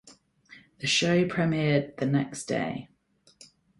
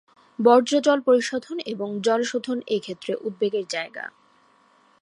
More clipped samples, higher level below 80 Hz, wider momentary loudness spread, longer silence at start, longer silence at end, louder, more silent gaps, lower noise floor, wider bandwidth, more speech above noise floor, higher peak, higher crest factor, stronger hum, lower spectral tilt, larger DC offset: neither; first, -62 dBFS vs -78 dBFS; second, 10 LU vs 14 LU; second, 0.05 s vs 0.4 s; about the same, 0.95 s vs 0.95 s; second, -27 LUFS vs -23 LUFS; neither; about the same, -59 dBFS vs -59 dBFS; about the same, 11.5 kHz vs 11 kHz; second, 32 dB vs 37 dB; second, -12 dBFS vs -4 dBFS; about the same, 18 dB vs 20 dB; neither; about the same, -5 dB/octave vs -4 dB/octave; neither